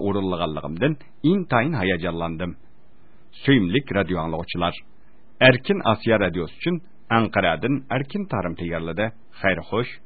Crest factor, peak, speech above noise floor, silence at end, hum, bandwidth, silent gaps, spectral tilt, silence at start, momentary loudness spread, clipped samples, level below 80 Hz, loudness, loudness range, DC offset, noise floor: 22 dB; 0 dBFS; 35 dB; 0.1 s; none; 4.8 kHz; none; -11 dB/octave; 0 s; 9 LU; under 0.1%; -46 dBFS; -23 LUFS; 4 LU; 1%; -57 dBFS